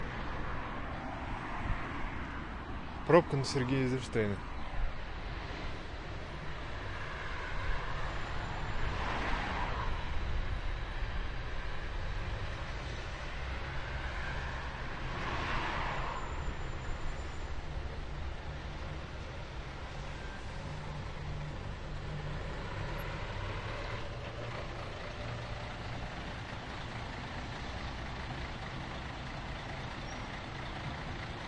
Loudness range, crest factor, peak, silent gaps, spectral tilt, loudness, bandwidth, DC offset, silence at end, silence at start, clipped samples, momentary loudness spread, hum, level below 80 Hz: 9 LU; 26 dB; -12 dBFS; none; -6 dB/octave; -39 LUFS; 11 kHz; under 0.1%; 0 s; 0 s; under 0.1%; 8 LU; none; -42 dBFS